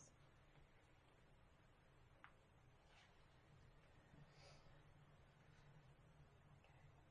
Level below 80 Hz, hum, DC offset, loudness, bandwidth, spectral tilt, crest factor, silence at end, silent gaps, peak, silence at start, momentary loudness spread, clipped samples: -76 dBFS; none; under 0.1%; -69 LUFS; 9.6 kHz; -4.5 dB/octave; 24 dB; 0 s; none; -44 dBFS; 0 s; 3 LU; under 0.1%